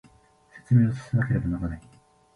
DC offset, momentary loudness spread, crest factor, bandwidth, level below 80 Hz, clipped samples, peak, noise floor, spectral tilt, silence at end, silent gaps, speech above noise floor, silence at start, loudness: under 0.1%; 12 LU; 16 dB; 6.6 kHz; -44 dBFS; under 0.1%; -10 dBFS; -58 dBFS; -9.5 dB/octave; 0.55 s; none; 34 dB; 0.55 s; -25 LUFS